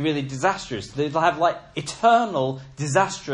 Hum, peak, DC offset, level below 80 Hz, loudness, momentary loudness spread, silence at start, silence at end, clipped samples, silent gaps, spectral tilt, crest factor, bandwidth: none; -6 dBFS; under 0.1%; -56 dBFS; -23 LUFS; 12 LU; 0 s; 0 s; under 0.1%; none; -5 dB/octave; 18 dB; 10.5 kHz